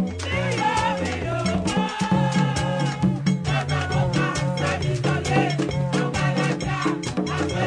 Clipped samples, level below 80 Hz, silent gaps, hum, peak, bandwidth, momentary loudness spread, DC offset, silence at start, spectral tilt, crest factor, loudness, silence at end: under 0.1%; -42 dBFS; none; none; -6 dBFS; 10 kHz; 4 LU; under 0.1%; 0 s; -5.5 dB/octave; 16 dB; -23 LUFS; 0 s